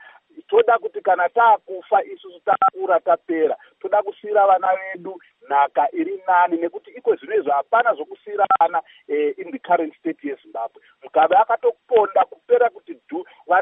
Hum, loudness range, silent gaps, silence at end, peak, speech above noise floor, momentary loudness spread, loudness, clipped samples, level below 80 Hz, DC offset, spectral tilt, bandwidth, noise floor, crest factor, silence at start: none; 2 LU; none; 0 s; -4 dBFS; 25 dB; 14 LU; -20 LUFS; under 0.1%; -82 dBFS; under 0.1%; -8 dB/octave; 3.8 kHz; -45 dBFS; 16 dB; 0.35 s